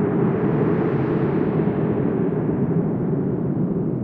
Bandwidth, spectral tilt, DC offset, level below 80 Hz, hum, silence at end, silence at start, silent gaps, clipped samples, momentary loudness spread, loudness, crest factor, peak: 4.2 kHz; -12 dB/octave; under 0.1%; -46 dBFS; none; 0 s; 0 s; none; under 0.1%; 3 LU; -21 LUFS; 12 dB; -8 dBFS